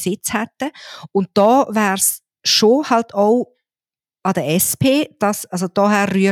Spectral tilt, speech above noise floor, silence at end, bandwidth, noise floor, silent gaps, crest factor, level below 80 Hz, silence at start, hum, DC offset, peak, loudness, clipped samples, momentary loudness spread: -4 dB/octave; over 74 dB; 0 s; 18 kHz; under -90 dBFS; none; 16 dB; -58 dBFS; 0 s; none; under 0.1%; -2 dBFS; -17 LUFS; under 0.1%; 10 LU